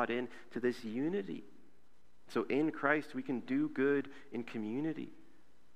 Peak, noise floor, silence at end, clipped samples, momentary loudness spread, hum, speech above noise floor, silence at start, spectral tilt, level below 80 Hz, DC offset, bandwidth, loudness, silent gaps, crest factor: -16 dBFS; -71 dBFS; 0.6 s; under 0.1%; 12 LU; none; 35 dB; 0 s; -7 dB/octave; -78 dBFS; 0.3%; 12 kHz; -37 LUFS; none; 22 dB